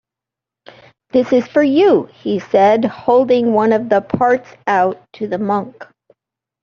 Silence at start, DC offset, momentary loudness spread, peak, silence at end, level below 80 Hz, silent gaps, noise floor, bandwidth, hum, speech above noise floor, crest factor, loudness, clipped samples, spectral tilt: 1.15 s; under 0.1%; 9 LU; -2 dBFS; 0.8 s; -58 dBFS; none; -86 dBFS; 7.2 kHz; none; 71 dB; 14 dB; -15 LUFS; under 0.1%; -7 dB/octave